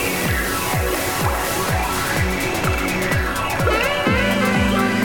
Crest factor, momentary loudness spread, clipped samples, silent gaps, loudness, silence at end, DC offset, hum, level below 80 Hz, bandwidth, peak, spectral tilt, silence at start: 14 dB; 3 LU; under 0.1%; none; -19 LUFS; 0 s; under 0.1%; none; -30 dBFS; 19 kHz; -6 dBFS; -4.5 dB/octave; 0 s